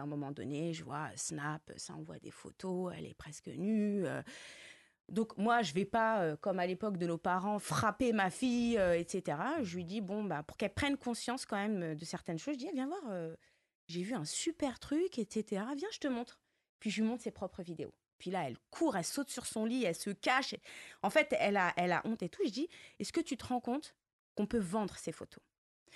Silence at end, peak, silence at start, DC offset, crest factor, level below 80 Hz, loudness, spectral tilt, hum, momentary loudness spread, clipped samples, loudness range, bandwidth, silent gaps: 0 s; -18 dBFS; 0 s; under 0.1%; 20 dB; -66 dBFS; -37 LUFS; -4.5 dB/octave; none; 15 LU; under 0.1%; 6 LU; 12 kHz; 13.75-13.88 s, 16.69-16.79 s, 18.13-18.19 s, 24.13-24.35 s, 25.58-25.86 s